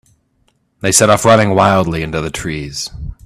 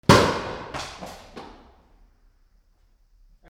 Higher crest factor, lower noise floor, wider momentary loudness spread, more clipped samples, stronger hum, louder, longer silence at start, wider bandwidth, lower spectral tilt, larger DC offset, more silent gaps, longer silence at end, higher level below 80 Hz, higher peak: second, 14 dB vs 24 dB; about the same, -60 dBFS vs -61 dBFS; second, 13 LU vs 26 LU; neither; neither; first, -13 LUFS vs -23 LUFS; first, 0.85 s vs 0.1 s; about the same, 17.5 kHz vs 17 kHz; about the same, -4 dB/octave vs -5 dB/octave; neither; neither; second, 0.15 s vs 2.05 s; first, -36 dBFS vs -46 dBFS; about the same, 0 dBFS vs -2 dBFS